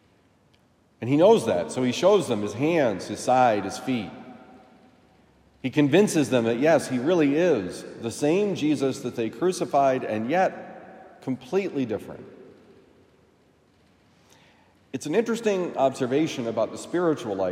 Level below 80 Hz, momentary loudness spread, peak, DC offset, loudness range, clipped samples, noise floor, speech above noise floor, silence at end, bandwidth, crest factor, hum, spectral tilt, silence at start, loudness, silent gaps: -70 dBFS; 14 LU; -4 dBFS; under 0.1%; 11 LU; under 0.1%; -61 dBFS; 38 dB; 0 s; 16 kHz; 20 dB; none; -5.5 dB/octave; 1 s; -24 LUFS; none